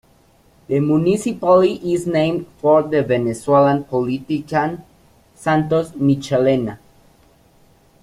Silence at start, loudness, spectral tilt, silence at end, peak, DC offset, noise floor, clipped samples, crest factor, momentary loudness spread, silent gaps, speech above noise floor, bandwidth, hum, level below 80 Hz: 0.7 s; -18 LUFS; -7 dB/octave; 1.25 s; -2 dBFS; under 0.1%; -53 dBFS; under 0.1%; 16 dB; 8 LU; none; 37 dB; 13.5 kHz; none; -52 dBFS